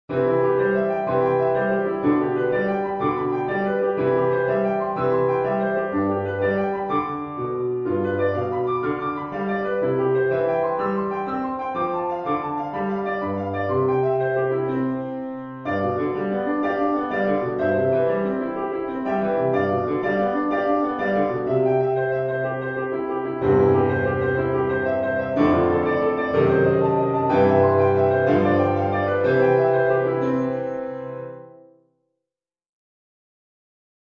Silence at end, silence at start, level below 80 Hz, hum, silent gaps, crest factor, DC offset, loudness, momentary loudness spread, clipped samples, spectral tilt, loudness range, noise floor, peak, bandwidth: 2.5 s; 0.1 s; -54 dBFS; none; none; 16 dB; under 0.1%; -22 LUFS; 8 LU; under 0.1%; -9.5 dB/octave; 5 LU; -87 dBFS; -4 dBFS; 5.8 kHz